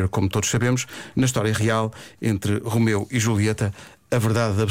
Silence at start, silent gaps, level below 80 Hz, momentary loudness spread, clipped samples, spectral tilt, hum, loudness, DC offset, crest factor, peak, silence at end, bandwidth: 0 s; none; -48 dBFS; 7 LU; under 0.1%; -5.5 dB/octave; none; -22 LUFS; under 0.1%; 12 dB; -10 dBFS; 0 s; 16.5 kHz